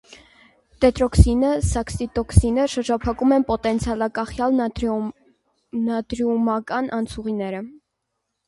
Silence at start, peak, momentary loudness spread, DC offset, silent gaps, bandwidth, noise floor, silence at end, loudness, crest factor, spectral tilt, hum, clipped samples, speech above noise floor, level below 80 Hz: 0.8 s; 0 dBFS; 9 LU; under 0.1%; none; 11.5 kHz; -77 dBFS; 0.75 s; -21 LUFS; 22 dB; -6.5 dB/octave; none; under 0.1%; 57 dB; -30 dBFS